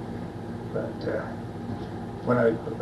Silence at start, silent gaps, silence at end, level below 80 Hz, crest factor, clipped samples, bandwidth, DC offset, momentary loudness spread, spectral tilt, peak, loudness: 0 s; none; 0 s; -50 dBFS; 18 dB; under 0.1%; 12 kHz; under 0.1%; 12 LU; -8.5 dB/octave; -10 dBFS; -30 LUFS